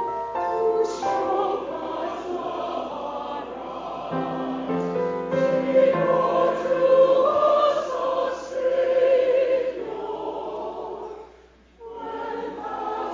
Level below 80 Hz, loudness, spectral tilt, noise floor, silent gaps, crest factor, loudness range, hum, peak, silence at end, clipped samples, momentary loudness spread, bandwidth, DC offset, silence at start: -58 dBFS; -24 LUFS; -6 dB/octave; -52 dBFS; none; 16 dB; 9 LU; none; -8 dBFS; 0 s; under 0.1%; 14 LU; 7.6 kHz; under 0.1%; 0 s